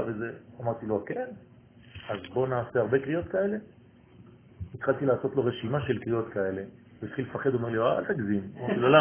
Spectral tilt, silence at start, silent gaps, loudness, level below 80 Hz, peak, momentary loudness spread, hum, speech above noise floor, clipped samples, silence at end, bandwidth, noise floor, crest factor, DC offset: -10.5 dB/octave; 0 s; none; -30 LUFS; -58 dBFS; -6 dBFS; 12 LU; none; 26 dB; under 0.1%; 0 s; 3.5 kHz; -54 dBFS; 24 dB; under 0.1%